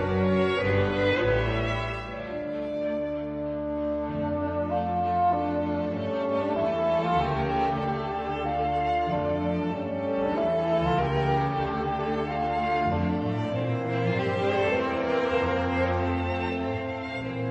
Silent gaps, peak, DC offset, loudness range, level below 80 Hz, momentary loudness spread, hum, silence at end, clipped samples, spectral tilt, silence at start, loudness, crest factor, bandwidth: none; -12 dBFS; under 0.1%; 2 LU; -44 dBFS; 6 LU; none; 0 s; under 0.1%; -8 dB/octave; 0 s; -27 LUFS; 14 dB; 8.4 kHz